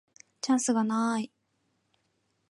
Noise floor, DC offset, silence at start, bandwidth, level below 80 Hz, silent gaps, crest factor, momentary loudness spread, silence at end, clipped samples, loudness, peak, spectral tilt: -75 dBFS; under 0.1%; 0.45 s; 11.5 kHz; -84 dBFS; none; 16 dB; 11 LU; 1.25 s; under 0.1%; -28 LUFS; -16 dBFS; -4 dB/octave